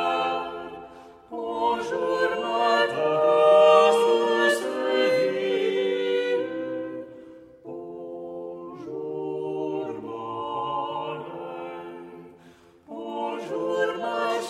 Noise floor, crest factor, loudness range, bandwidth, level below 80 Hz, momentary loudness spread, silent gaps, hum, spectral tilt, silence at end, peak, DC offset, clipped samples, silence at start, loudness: -53 dBFS; 20 dB; 14 LU; 14 kHz; -68 dBFS; 19 LU; none; none; -4 dB/octave; 0 s; -4 dBFS; under 0.1%; under 0.1%; 0 s; -24 LUFS